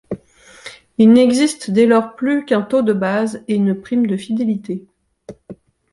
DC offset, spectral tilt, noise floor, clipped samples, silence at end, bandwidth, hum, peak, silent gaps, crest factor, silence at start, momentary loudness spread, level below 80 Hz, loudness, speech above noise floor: under 0.1%; -6 dB/octave; -45 dBFS; under 0.1%; 0.4 s; 11.5 kHz; none; -2 dBFS; none; 14 dB; 0.1 s; 20 LU; -58 dBFS; -16 LUFS; 30 dB